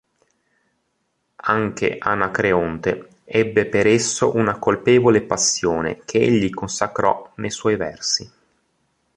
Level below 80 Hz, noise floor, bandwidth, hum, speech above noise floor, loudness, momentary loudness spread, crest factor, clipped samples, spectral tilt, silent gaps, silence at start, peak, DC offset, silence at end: -50 dBFS; -71 dBFS; 11 kHz; none; 52 dB; -19 LUFS; 8 LU; 20 dB; under 0.1%; -4 dB/octave; none; 1.45 s; 0 dBFS; under 0.1%; 0.9 s